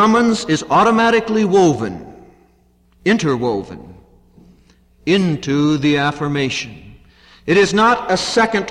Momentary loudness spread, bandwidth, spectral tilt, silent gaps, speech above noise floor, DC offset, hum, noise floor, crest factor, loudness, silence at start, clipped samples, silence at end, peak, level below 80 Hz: 13 LU; 11 kHz; -5 dB/octave; none; 39 dB; under 0.1%; none; -55 dBFS; 14 dB; -16 LUFS; 0 s; under 0.1%; 0 s; -4 dBFS; -48 dBFS